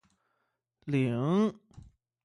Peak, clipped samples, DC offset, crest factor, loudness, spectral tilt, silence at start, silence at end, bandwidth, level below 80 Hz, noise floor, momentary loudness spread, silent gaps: -16 dBFS; under 0.1%; under 0.1%; 16 dB; -30 LUFS; -8.5 dB/octave; 0.85 s; 0.45 s; 11 kHz; -66 dBFS; -81 dBFS; 7 LU; none